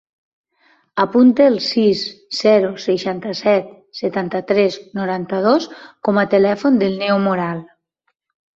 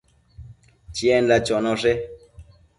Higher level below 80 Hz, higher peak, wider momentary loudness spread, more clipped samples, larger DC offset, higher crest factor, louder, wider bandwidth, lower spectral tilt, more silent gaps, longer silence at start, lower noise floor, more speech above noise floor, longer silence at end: second, -62 dBFS vs -48 dBFS; first, -2 dBFS vs -6 dBFS; second, 11 LU vs 14 LU; neither; neither; about the same, 16 dB vs 18 dB; first, -17 LUFS vs -20 LUFS; second, 7.6 kHz vs 11.5 kHz; about the same, -6 dB/octave vs -5 dB/octave; neither; first, 0.95 s vs 0.4 s; first, -71 dBFS vs -48 dBFS; first, 55 dB vs 28 dB; first, 0.9 s vs 0.35 s